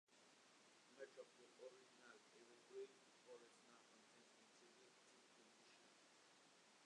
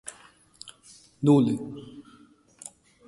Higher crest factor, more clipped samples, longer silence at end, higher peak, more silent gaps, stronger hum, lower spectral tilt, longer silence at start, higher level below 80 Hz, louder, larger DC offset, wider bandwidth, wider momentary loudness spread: about the same, 20 dB vs 20 dB; neither; second, 0 s vs 1.05 s; second, -46 dBFS vs -8 dBFS; neither; neither; second, -2 dB/octave vs -7.5 dB/octave; about the same, 0.1 s vs 0.05 s; second, under -90 dBFS vs -66 dBFS; second, -65 LUFS vs -23 LUFS; neither; about the same, 10.5 kHz vs 11.5 kHz; second, 10 LU vs 25 LU